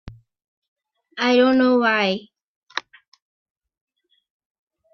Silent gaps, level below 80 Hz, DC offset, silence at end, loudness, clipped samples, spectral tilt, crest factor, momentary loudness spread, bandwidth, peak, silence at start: 0.48-0.62 s, 0.68-0.76 s, 2.43-2.67 s; -58 dBFS; under 0.1%; 2.15 s; -18 LUFS; under 0.1%; -5 dB/octave; 20 dB; 16 LU; 6.6 kHz; -4 dBFS; 0.05 s